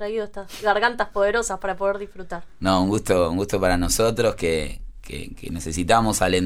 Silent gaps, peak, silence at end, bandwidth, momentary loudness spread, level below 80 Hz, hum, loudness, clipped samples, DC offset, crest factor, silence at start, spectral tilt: none; -2 dBFS; 0 s; 16 kHz; 15 LU; -36 dBFS; none; -22 LUFS; under 0.1%; under 0.1%; 20 dB; 0 s; -4 dB/octave